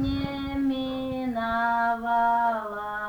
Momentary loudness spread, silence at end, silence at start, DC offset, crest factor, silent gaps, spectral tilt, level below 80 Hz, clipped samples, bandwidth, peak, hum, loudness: 7 LU; 0 s; 0 s; under 0.1%; 12 dB; none; -7 dB/octave; -46 dBFS; under 0.1%; over 20 kHz; -14 dBFS; none; -26 LUFS